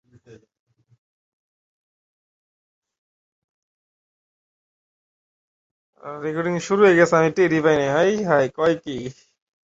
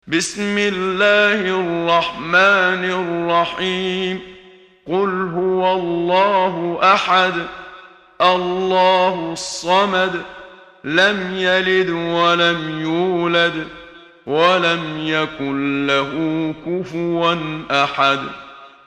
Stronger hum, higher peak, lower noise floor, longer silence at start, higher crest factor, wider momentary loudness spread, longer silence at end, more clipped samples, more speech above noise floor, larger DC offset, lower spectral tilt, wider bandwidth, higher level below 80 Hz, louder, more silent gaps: neither; about the same, -2 dBFS vs 0 dBFS; first, -50 dBFS vs -45 dBFS; first, 0.3 s vs 0.05 s; about the same, 20 dB vs 18 dB; first, 17 LU vs 10 LU; first, 0.5 s vs 0.2 s; neither; about the same, 31 dB vs 28 dB; neither; first, -6 dB/octave vs -4.5 dB/octave; second, 8 kHz vs 11.5 kHz; second, -62 dBFS vs -54 dBFS; about the same, -19 LUFS vs -17 LUFS; first, 0.59-0.67 s, 0.98-2.82 s, 2.98-5.93 s vs none